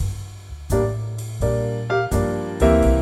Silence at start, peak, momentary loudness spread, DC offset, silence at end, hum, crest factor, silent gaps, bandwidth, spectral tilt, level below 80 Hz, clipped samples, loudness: 0 s; -4 dBFS; 14 LU; under 0.1%; 0 s; none; 18 dB; none; 15.5 kHz; -7 dB/octave; -26 dBFS; under 0.1%; -22 LUFS